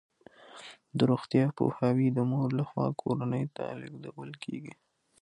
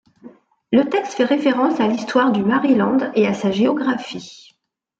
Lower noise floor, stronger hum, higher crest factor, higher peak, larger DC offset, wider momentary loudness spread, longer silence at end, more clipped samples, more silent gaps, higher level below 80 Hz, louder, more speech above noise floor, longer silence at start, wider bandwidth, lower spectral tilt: second, -54 dBFS vs -65 dBFS; neither; about the same, 18 dB vs 16 dB; second, -12 dBFS vs -4 dBFS; neither; first, 19 LU vs 7 LU; second, 0.5 s vs 0.65 s; neither; neither; second, -70 dBFS vs -62 dBFS; second, -30 LUFS vs -18 LUFS; second, 24 dB vs 48 dB; first, 0.55 s vs 0.25 s; first, 10 kHz vs 7.8 kHz; first, -8.5 dB/octave vs -6 dB/octave